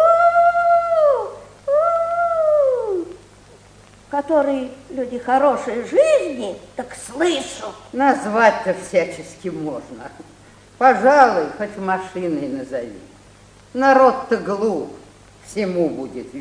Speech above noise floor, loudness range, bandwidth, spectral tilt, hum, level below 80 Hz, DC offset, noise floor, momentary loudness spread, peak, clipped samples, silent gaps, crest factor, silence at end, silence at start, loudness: 28 dB; 3 LU; 10.5 kHz; -5 dB/octave; 50 Hz at -50 dBFS; -56 dBFS; under 0.1%; -47 dBFS; 17 LU; 0 dBFS; under 0.1%; none; 18 dB; 0 s; 0 s; -18 LUFS